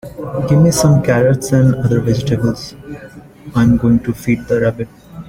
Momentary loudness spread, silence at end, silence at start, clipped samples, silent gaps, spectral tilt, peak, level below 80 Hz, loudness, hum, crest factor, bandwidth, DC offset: 16 LU; 0 s; 0.05 s; under 0.1%; none; -7 dB/octave; -2 dBFS; -36 dBFS; -14 LUFS; none; 12 dB; 16.5 kHz; under 0.1%